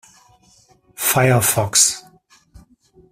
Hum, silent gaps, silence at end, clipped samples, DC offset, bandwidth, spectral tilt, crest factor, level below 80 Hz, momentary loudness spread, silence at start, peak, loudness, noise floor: none; none; 1.1 s; under 0.1%; under 0.1%; 16 kHz; -3 dB/octave; 20 dB; -52 dBFS; 7 LU; 1 s; -2 dBFS; -15 LUFS; -54 dBFS